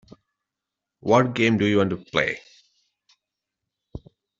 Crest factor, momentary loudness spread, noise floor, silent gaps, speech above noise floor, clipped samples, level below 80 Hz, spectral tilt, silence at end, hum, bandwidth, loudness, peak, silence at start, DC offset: 22 dB; 24 LU; -86 dBFS; none; 65 dB; under 0.1%; -56 dBFS; -6 dB/octave; 0.4 s; none; 7.8 kHz; -22 LUFS; -4 dBFS; 1.05 s; under 0.1%